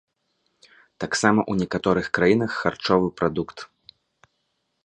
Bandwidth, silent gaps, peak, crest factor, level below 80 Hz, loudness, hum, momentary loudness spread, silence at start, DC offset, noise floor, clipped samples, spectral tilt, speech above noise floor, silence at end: 11 kHz; none; -2 dBFS; 22 dB; -54 dBFS; -22 LUFS; none; 15 LU; 1 s; under 0.1%; -74 dBFS; under 0.1%; -5 dB/octave; 52 dB; 1.2 s